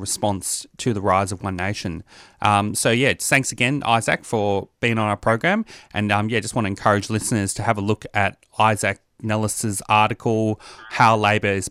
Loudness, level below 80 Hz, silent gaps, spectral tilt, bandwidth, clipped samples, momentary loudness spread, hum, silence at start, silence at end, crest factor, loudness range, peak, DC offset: -21 LUFS; -52 dBFS; none; -4.5 dB/octave; 15.5 kHz; under 0.1%; 8 LU; none; 0 s; 0 s; 18 dB; 2 LU; -2 dBFS; under 0.1%